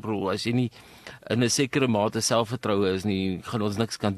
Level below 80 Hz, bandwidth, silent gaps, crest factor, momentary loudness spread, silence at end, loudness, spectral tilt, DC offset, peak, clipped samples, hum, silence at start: -60 dBFS; 13 kHz; none; 18 dB; 8 LU; 0 s; -26 LUFS; -4.5 dB/octave; under 0.1%; -8 dBFS; under 0.1%; none; 0.05 s